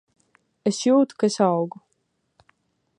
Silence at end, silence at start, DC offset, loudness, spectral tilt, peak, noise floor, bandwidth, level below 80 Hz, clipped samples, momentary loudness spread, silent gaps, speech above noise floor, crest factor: 1.3 s; 0.65 s; under 0.1%; -22 LUFS; -5.5 dB/octave; -6 dBFS; -72 dBFS; 11 kHz; -76 dBFS; under 0.1%; 8 LU; none; 52 dB; 18 dB